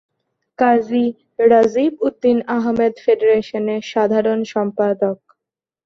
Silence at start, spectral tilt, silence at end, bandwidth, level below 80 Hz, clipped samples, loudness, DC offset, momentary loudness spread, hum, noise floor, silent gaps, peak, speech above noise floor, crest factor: 0.6 s; -6.5 dB/octave; 0.7 s; 7 kHz; -60 dBFS; under 0.1%; -17 LUFS; under 0.1%; 8 LU; none; -85 dBFS; none; -2 dBFS; 69 dB; 16 dB